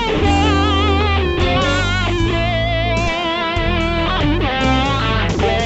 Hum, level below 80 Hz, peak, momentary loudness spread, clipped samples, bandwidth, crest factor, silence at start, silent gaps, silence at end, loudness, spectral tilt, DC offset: none; -24 dBFS; -4 dBFS; 3 LU; under 0.1%; 8.2 kHz; 12 dB; 0 s; none; 0 s; -16 LUFS; -5.5 dB/octave; under 0.1%